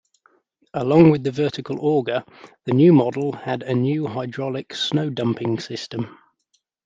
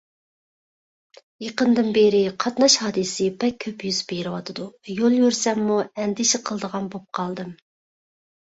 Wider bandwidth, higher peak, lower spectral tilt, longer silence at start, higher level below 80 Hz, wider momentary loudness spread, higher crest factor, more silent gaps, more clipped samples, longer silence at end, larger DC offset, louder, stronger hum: about the same, 7.6 kHz vs 8.2 kHz; about the same, -2 dBFS vs -4 dBFS; first, -7.5 dB/octave vs -3.5 dB/octave; second, 0.75 s vs 1.4 s; about the same, -60 dBFS vs -64 dBFS; about the same, 14 LU vs 14 LU; about the same, 20 dB vs 18 dB; neither; neither; second, 0.8 s vs 0.95 s; neither; about the same, -21 LUFS vs -22 LUFS; neither